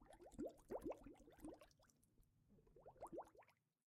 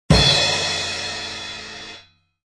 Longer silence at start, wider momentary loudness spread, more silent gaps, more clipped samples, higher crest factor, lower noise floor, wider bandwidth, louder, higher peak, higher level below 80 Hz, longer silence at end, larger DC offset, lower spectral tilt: about the same, 0 s vs 0.1 s; second, 14 LU vs 20 LU; neither; neither; about the same, 20 dB vs 20 dB; first, -77 dBFS vs -47 dBFS; first, 15 kHz vs 10.5 kHz; second, -57 LUFS vs -18 LUFS; second, -40 dBFS vs -2 dBFS; second, -74 dBFS vs -34 dBFS; about the same, 0.4 s vs 0.45 s; neither; first, -6.5 dB/octave vs -3.5 dB/octave